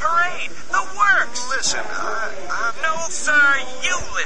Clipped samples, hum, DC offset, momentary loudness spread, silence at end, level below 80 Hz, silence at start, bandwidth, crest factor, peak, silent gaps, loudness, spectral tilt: under 0.1%; none; 8%; 10 LU; 0 s; -50 dBFS; 0 s; 11.5 kHz; 16 dB; -4 dBFS; none; -20 LUFS; -0.5 dB/octave